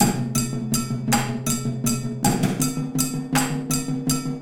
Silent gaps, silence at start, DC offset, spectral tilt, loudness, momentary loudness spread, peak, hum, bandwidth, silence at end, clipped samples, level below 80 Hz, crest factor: none; 0 s; under 0.1%; -4.5 dB/octave; -23 LUFS; 3 LU; -4 dBFS; none; 17 kHz; 0 s; under 0.1%; -44 dBFS; 20 dB